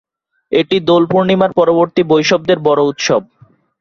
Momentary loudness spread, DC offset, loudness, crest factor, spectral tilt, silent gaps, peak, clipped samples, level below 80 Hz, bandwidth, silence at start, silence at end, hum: 4 LU; under 0.1%; -13 LUFS; 12 dB; -5.5 dB/octave; none; 0 dBFS; under 0.1%; -54 dBFS; 7.4 kHz; 0.5 s; 0.6 s; none